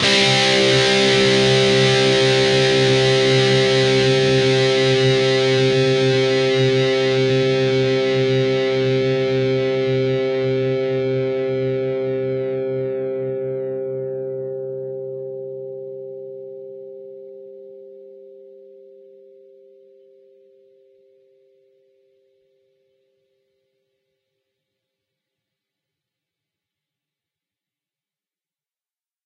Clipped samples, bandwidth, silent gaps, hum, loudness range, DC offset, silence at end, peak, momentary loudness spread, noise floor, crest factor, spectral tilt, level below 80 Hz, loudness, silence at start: under 0.1%; 11 kHz; none; none; 18 LU; under 0.1%; 10.95 s; -4 dBFS; 18 LU; under -90 dBFS; 16 dB; -4.5 dB/octave; -54 dBFS; -17 LUFS; 0 s